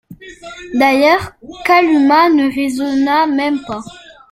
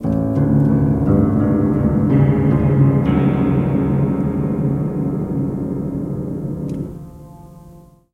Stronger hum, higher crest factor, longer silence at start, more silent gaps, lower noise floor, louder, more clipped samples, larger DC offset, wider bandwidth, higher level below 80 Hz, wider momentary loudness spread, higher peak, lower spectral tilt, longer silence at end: neither; about the same, 14 dB vs 16 dB; about the same, 0.1 s vs 0 s; neither; second, -34 dBFS vs -43 dBFS; first, -13 LUFS vs -17 LUFS; neither; neither; first, 14.5 kHz vs 3.7 kHz; second, -50 dBFS vs -34 dBFS; first, 20 LU vs 10 LU; about the same, 0 dBFS vs -2 dBFS; second, -4.5 dB/octave vs -11 dB/octave; about the same, 0.35 s vs 0.35 s